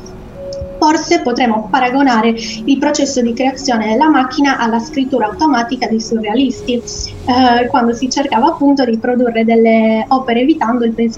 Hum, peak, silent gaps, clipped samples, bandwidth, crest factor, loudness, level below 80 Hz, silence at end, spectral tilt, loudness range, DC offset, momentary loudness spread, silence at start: none; 0 dBFS; none; under 0.1%; 8 kHz; 12 dB; -13 LUFS; -40 dBFS; 0 s; -4.5 dB/octave; 2 LU; under 0.1%; 7 LU; 0 s